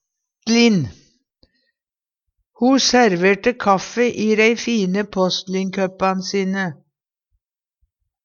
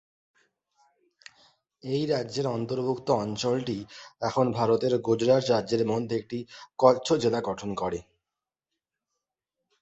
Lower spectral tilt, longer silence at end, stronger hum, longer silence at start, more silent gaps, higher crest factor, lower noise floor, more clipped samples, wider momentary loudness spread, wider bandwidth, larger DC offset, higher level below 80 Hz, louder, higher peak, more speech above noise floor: second, -4.5 dB/octave vs -6 dB/octave; second, 1.5 s vs 1.8 s; neither; second, 0.45 s vs 1.85 s; neither; about the same, 18 dB vs 22 dB; about the same, under -90 dBFS vs -89 dBFS; neither; second, 9 LU vs 13 LU; second, 7.4 kHz vs 8.2 kHz; neither; first, -56 dBFS vs -62 dBFS; first, -18 LUFS vs -27 LUFS; first, -2 dBFS vs -6 dBFS; first, over 73 dB vs 63 dB